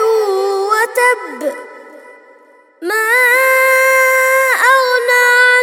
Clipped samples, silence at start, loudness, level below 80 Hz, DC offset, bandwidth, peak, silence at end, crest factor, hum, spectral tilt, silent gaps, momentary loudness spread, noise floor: under 0.1%; 0 s; -11 LUFS; -76 dBFS; under 0.1%; 18 kHz; 0 dBFS; 0 s; 12 dB; none; 1 dB/octave; none; 12 LU; -46 dBFS